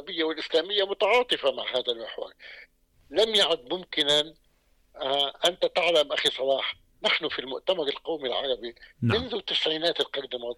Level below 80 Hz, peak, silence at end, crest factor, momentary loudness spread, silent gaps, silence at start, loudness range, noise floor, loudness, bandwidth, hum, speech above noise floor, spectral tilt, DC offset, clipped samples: -60 dBFS; -12 dBFS; 0.05 s; 16 dB; 11 LU; none; 0 s; 3 LU; -65 dBFS; -26 LUFS; 17 kHz; none; 38 dB; -3.5 dB/octave; under 0.1%; under 0.1%